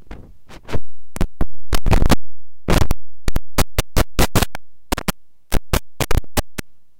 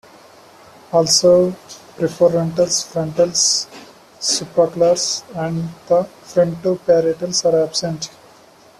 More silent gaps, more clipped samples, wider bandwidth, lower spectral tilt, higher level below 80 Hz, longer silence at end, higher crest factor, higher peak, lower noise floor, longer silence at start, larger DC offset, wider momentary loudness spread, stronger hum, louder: neither; neither; first, 17.5 kHz vs 13.5 kHz; about the same, -4.5 dB/octave vs -3.5 dB/octave; first, -24 dBFS vs -56 dBFS; second, 0.4 s vs 0.7 s; second, 10 dB vs 16 dB; about the same, -4 dBFS vs -2 dBFS; second, -36 dBFS vs -47 dBFS; second, 0.1 s vs 0.9 s; neither; first, 15 LU vs 11 LU; neither; second, -22 LUFS vs -17 LUFS